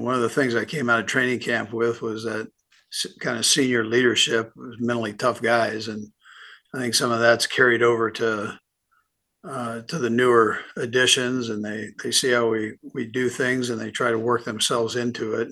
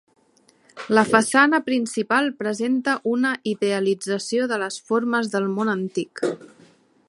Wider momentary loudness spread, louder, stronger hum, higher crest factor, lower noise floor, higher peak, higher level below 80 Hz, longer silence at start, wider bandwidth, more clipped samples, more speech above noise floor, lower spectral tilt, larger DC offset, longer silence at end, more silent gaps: first, 13 LU vs 10 LU; about the same, -22 LUFS vs -22 LUFS; neither; about the same, 20 dB vs 22 dB; first, -69 dBFS vs -59 dBFS; second, -4 dBFS vs 0 dBFS; about the same, -68 dBFS vs -72 dBFS; second, 0 s vs 0.75 s; about the same, 12.5 kHz vs 11.5 kHz; neither; first, 46 dB vs 38 dB; second, -3 dB/octave vs -4.5 dB/octave; neither; second, 0 s vs 0.6 s; neither